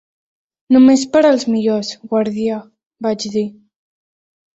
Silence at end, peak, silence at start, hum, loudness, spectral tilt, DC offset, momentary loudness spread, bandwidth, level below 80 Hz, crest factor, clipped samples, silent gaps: 1.05 s; -2 dBFS; 0.7 s; none; -15 LUFS; -5 dB/octave; under 0.1%; 12 LU; 8 kHz; -58 dBFS; 14 dB; under 0.1%; 2.86-2.90 s